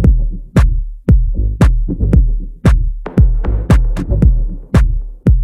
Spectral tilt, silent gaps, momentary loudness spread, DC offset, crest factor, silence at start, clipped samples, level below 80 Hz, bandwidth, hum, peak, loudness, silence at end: -8.5 dB/octave; none; 6 LU; under 0.1%; 12 dB; 0 s; under 0.1%; -12 dBFS; 9.6 kHz; none; 0 dBFS; -15 LUFS; 0 s